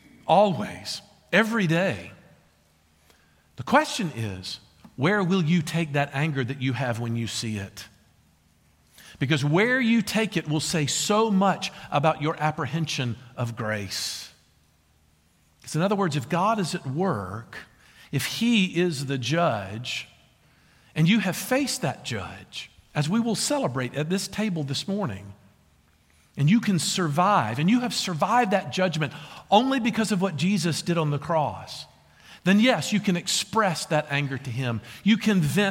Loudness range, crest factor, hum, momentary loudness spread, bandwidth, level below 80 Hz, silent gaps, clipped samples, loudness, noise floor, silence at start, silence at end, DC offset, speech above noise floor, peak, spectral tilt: 5 LU; 20 dB; none; 13 LU; 16.5 kHz; -62 dBFS; none; under 0.1%; -25 LUFS; -62 dBFS; 0.25 s; 0 s; under 0.1%; 38 dB; -6 dBFS; -5 dB/octave